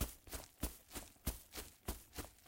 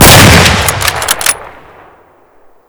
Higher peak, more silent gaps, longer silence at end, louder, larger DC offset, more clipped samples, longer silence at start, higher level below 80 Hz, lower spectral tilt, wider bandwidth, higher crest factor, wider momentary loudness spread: second, -24 dBFS vs 0 dBFS; neither; second, 0 s vs 1.2 s; second, -49 LUFS vs -6 LUFS; neither; second, under 0.1% vs 10%; about the same, 0 s vs 0 s; second, -52 dBFS vs -22 dBFS; about the same, -3.5 dB/octave vs -3 dB/octave; second, 17 kHz vs over 20 kHz; first, 24 dB vs 8 dB; second, 5 LU vs 11 LU